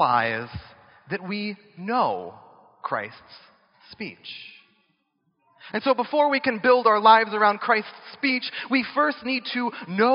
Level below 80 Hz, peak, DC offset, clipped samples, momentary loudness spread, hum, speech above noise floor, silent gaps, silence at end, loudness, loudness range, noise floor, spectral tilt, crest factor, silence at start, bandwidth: -64 dBFS; -2 dBFS; under 0.1%; under 0.1%; 21 LU; none; 49 dB; none; 0 s; -23 LUFS; 15 LU; -72 dBFS; -2 dB/octave; 22 dB; 0 s; 5.6 kHz